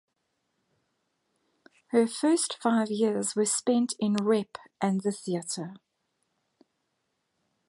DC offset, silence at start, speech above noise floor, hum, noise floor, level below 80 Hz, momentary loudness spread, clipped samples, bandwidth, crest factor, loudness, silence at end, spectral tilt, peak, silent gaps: under 0.1%; 1.95 s; 52 dB; none; -79 dBFS; -78 dBFS; 8 LU; under 0.1%; 11.5 kHz; 20 dB; -27 LUFS; 1.9 s; -4.5 dB/octave; -10 dBFS; none